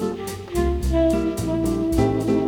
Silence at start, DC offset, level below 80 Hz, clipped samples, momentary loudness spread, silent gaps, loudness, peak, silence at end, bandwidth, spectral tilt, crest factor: 0 s; under 0.1%; -30 dBFS; under 0.1%; 8 LU; none; -22 LUFS; -6 dBFS; 0 s; 19.5 kHz; -7 dB/octave; 16 dB